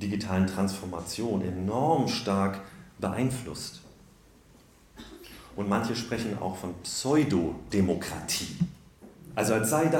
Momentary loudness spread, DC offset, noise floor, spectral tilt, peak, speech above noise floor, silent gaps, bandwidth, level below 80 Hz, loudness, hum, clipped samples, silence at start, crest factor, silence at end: 15 LU; under 0.1%; -57 dBFS; -5 dB/octave; -12 dBFS; 29 dB; none; 17.5 kHz; -56 dBFS; -29 LUFS; none; under 0.1%; 0 s; 18 dB; 0 s